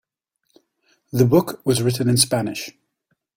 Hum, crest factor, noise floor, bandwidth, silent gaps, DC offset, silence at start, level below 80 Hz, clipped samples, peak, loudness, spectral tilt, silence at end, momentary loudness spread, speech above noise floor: none; 20 dB; -73 dBFS; 16.5 kHz; none; under 0.1%; 1.15 s; -54 dBFS; under 0.1%; -2 dBFS; -19 LUFS; -5 dB/octave; 0.65 s; 12 LU; 54 dB